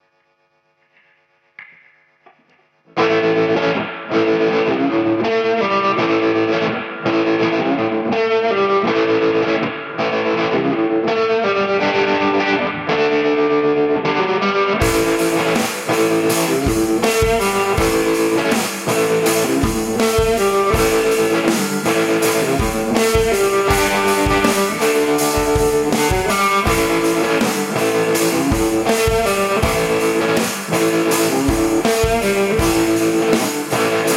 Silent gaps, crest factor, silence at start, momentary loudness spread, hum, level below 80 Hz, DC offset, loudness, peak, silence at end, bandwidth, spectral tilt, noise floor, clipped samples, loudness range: none; 16 dB; 1.6 s; 3 LU; none; -34 dBFS; under 0.1%; -16 LUFS; -2 dBFS; 0 s; 16 kHz; -4 dB/octave; -62 dBFS; under 0.1%; 2 LU